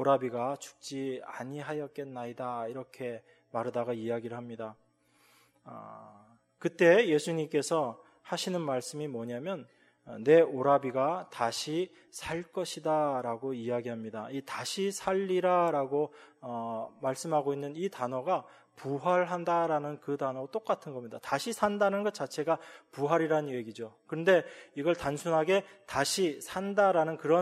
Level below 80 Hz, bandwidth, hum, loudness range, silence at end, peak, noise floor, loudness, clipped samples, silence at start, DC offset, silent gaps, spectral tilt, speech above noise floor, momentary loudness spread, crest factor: -70 dBFS; 15 kHz; none; 8 LU; 0 s; -10 dBFS; -67 dBFS; -31 LUFS; under 0.1%; 0 s; under 0.1%; none; -5 dB/octave; 36 dB; 14 LU; 20 dB